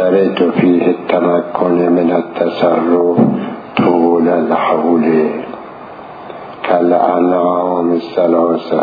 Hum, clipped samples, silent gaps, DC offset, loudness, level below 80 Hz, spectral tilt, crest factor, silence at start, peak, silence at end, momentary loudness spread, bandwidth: none; under 0.1%; none; under 0.1%; -13 LUFS; -58 dBFS; -10 dB/octave; 12 dB; 0 s; 0 dBFS; 0 s; 15 LU; 5 kHz